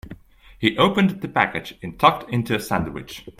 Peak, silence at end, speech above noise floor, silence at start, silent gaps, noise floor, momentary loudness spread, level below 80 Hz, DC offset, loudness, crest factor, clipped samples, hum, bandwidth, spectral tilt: 0 dBFS; 0.1 s; 22 dB; 0.05 s; none; -43 dBFS; 13 LU; -48 dBFS; under 0.1%; -21 LUFS; 22 dB; under 0.1%; none; 16 kHz; -5.5 dB/octave